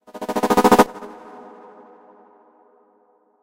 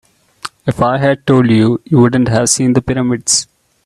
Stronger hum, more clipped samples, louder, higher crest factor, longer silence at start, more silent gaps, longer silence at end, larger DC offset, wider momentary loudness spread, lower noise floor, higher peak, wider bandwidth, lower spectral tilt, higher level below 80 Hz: neither; neither; second, -17 LUFS vs -12 LUFS; first, 22 dB vs 12 dB; second, 0.15 s vs 0.45 s; neither; first, 2.3 s vs 0.45 s; neither; first, 27 LU vs 11 LU; first, -60 dBFS vs -32 dBFS; about the same, 0 dBFS vs 0 dBFS; first, 17 kHz vs 13 kHz; about the same, -4.5 dB/octave vs -5 dB/octave; second, -50 dBFS vs -42 dBFS